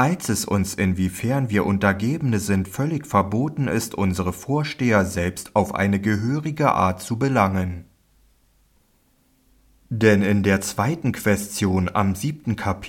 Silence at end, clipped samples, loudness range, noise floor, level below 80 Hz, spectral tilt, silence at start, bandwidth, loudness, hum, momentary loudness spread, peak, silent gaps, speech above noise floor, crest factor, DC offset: 0 s; under 0.1%; 3 LU; -62 dBFS; -52 dBFS; -6 dB/octave; 0 s; 17 kHz; -22 LUFS; none; 6 LU; -4 dBFS; none; 41 dB; 18 dB; under 0.1%